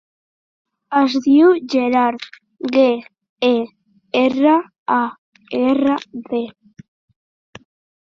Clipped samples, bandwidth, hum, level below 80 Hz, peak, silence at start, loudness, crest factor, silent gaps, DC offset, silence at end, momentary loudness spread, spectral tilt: under 0.1%; 7 kHz; none; -64 dBFS; -2 dBFS; 0.9 s; -17 LUFS; 16 dB; 3.29-3.36 s, 4.78-4.86 s, 5.18-5.32 s; under 0.1%; 1.5 s; 13 LU; -5 dB/octave